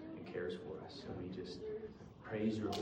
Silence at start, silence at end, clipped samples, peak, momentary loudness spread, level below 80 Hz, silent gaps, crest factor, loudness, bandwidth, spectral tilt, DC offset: 0 s; 0 s; under 0.1%; -26 dBFS; 10 LU; -68 dBFS; none; 18 dB; -44 LUFS; 16 kHz; -6.5 dB/octave; under 0.1%